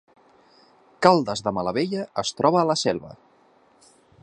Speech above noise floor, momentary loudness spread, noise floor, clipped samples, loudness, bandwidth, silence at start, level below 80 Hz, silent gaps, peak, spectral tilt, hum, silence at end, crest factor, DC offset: 36 dB; 8 LU; -58 dBFS; under 0.1%; -22 LUFS; 10.5 kHz; 1 s; -60 dBFS; none; 0 dBFS; -5 dB/octave; none; 1.1 s; 24 dB; under 0.1%